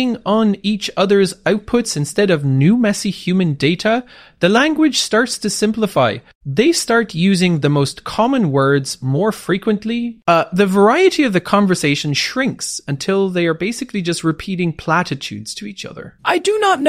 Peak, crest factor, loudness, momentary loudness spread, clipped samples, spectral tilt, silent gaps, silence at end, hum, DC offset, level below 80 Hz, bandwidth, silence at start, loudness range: -2 dBFS; 14 dB; -16 LUFS; 8 LU; under 0.1%; -5 dB/octave; 6.35-6.41 s; 0 s; none; under 0.1%; -50 dBFS; 15.5 kHz; 0 s; 4 LU